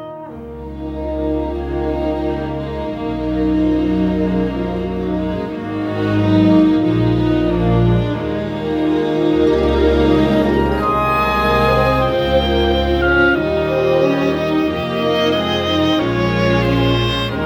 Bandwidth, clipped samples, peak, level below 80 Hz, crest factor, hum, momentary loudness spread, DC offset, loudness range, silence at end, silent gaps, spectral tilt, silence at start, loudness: 16 kHz; under 0.1%; -2 dBFS; -28 dBFS; 14 dB; none; 9 LU; under 0.1%; 4 LU; 0 s; none; -7.5 dB/octave; 0 s; -16 LUFS